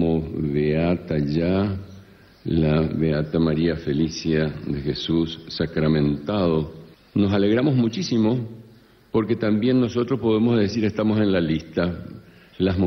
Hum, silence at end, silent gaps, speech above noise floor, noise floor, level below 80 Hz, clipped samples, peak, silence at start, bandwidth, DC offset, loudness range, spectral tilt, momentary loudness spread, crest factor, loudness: none; 0 s; none; 30 dB; -51 dBFS; -42 dBFS; under 0.1%; -8 dBFS; 0 s; 6.4 kHz; under 0.1%; 2 LU; -7.5 dB/octave; 8 LU; 14 dB; -22 LUFS